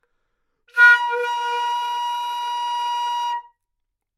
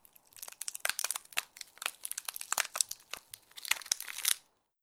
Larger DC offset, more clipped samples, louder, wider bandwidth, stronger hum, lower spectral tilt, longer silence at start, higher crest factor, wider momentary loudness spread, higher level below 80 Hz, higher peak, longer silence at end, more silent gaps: neither; neither; first, -20 LUFS vs -35 LUFS; second, 13.5 kHz vs over 20 kHz; neither; about the same, 4 dB/octave vs 3.5 dB/octave; first, 0.75 s vs 0.35 s; second, 20 dB vs 34 dB; about the same, 13 LU vs 14 LU; about the same, -78 dBFS vs -80 dBFS; about the same, -2 dBFS vs -4 dBFS; first, 0.75 s vs 0.45 s; neither